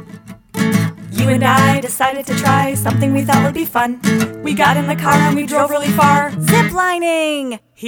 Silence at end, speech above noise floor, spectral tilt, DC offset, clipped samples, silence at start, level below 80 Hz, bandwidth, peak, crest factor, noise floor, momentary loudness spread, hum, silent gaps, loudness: 0 s; 22 dB; -5 dB/octave; under 0.1%; under 0.1%; 0 s; -48 dBFS; over 20 kHz; 0 dBFS; 14 dB; -36 dBFS; 6 LU; none; none; -14 LUFS